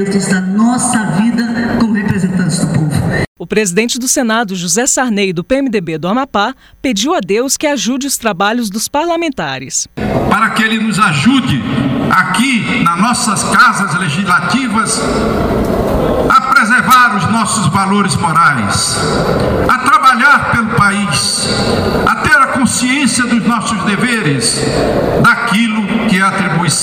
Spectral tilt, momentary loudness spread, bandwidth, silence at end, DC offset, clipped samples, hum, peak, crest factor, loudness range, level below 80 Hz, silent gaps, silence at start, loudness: -4 dB/octave; 7 LU; 17 kHz; 0 s; under 0.1%; under 0.1%; none; 0 dBFS; 12 dB; 4 LU; -34 dBFS; 3.27-3.36 s; 0 s; -11 LUFS